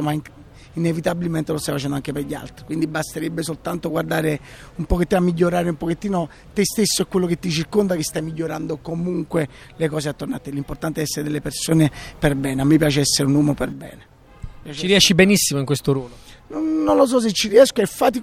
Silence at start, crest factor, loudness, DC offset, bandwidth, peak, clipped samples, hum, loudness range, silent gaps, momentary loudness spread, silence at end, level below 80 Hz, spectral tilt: 0 s; 20 dB; -20 LUFS; under 0.1%; 16.5 kHz; 0 dBFS; under 0.1%; none; 7 LU; none; 13 LU; 0 s; -40 dBFS; -4.5 dB/octave